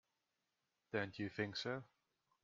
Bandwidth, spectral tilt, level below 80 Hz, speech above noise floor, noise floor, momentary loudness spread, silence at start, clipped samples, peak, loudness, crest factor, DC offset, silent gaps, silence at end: 7.4 kHz; -3.5 dB/octave; -82 dBFS; 45 dB; -89 dBFS; 4 LU; 0.95 s; under 0.1%; -26 dBFS; -45 LUFS; 22 dB; under 0.1%; none; 0.55 s